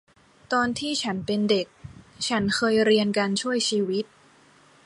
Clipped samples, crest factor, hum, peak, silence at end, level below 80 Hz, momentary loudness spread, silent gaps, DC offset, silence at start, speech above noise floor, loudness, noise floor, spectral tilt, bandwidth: under 0.1%; 16 dB; none; -8 dBFS; 0.8 s; -60 dBFS; 9 LU; none; under 0.1%; 0.5 s; 32 dB; -24 LUFS; -56 dBFS; -4 dB/octave; 11.5 kHz